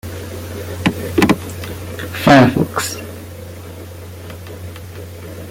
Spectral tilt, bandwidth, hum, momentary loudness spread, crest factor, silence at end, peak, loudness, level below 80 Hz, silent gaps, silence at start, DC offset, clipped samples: -5.5 dB/octave; 17 kHz; none; 22 LU; 18 dB; 0 s; 0 dBFS; -16 LUFS; -44 dBFS; none; 0.05 s; under 0.1%; under 0.1%